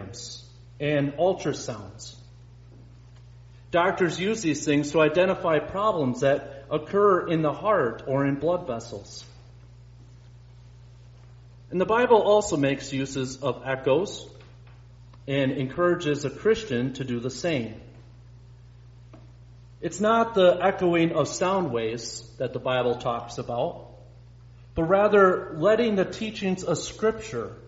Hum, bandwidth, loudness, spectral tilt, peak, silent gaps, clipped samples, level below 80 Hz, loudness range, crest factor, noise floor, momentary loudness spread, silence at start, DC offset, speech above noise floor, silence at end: none; 8 kHz; -25 LUFS; -5 dB/octave; -6 dBFS; none; under 0.1%; -54 dBFS; 7 LU; 20 dB; -48 dBFS; 16 LU; 0 s; under 0.1%; 24 dB; 0 s